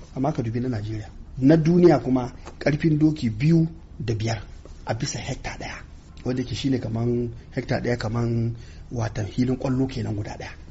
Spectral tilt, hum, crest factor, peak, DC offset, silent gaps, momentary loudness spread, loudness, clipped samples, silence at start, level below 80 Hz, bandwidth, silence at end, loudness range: -7 dB/octave; none; 18 dB; -6 dBFS; under 0.1%; none; 16 LU; -24 LUFS; under 0.1%; 0 s; -42 dBFS; 8 kHz; 0 s; 8 LU